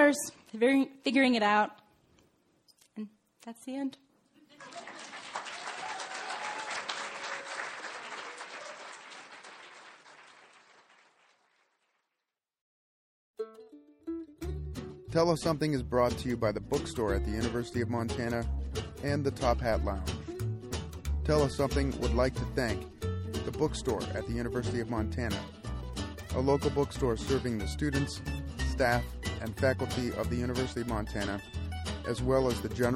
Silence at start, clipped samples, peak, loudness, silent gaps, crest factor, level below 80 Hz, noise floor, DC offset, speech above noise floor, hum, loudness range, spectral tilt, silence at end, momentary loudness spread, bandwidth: 0 s; under 0.1%; -12 dBFS; -32 LUFS; 12.61-13.34 s; 20 dB; -42 dBFS; -88 dBFS; under 0.1%; 57 dB; none; 14 LU; -5.5 dB/octave; 0 s; 16 LU; 16 kHz